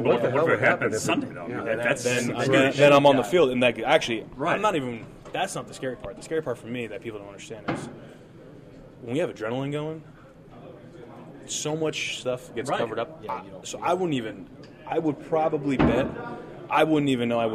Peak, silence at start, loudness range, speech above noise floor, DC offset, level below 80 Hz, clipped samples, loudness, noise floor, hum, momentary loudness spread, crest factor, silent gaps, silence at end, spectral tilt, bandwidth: -6 dBFS; 0 s; 13 LU; 23 dB; under 0.1%; -52 dBFS; under 0.1%; -25 LUFS; -47 dBFS; none; 19 LU; 20 dB; none; 0 s; -5 dB/octave; 14.5 kHz